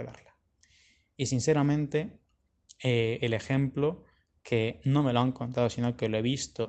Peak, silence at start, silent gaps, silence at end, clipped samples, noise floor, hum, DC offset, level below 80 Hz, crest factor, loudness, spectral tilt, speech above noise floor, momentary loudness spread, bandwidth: -10 dBFS; 0 s; none; 0 s; under 0.1%; -67 dBFS; none; under 0.1%; -62 dBFS; 20 dB; -29 LUFS; -6 dB/octave; 39 dB; 8 LU; 8.8 kHz